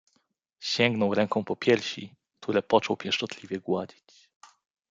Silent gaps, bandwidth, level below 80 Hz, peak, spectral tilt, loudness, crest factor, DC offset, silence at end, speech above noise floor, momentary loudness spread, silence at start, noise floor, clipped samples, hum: none; 9 kHz; -72 dBFS; -6 dBFS; -5 dB/octave; -27 LUFS; 22 dB; under 0.1%; 1.05 s; 46 dB; 14 LU; 0.6 s; -73 dBFS; under 0.1%; none